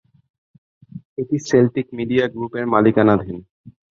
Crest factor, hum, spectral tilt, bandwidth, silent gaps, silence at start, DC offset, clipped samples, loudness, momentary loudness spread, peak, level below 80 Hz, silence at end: 18 dB; none; -7 dB/octave; 7.6 kHz; 1.05-1.16 s, 3.50-3.64 s; 0.95 s; under 0.1%; under 0.1%; -18 LUFS; 16 LU; -2 dBFS; -52 dBFS; 0.25 s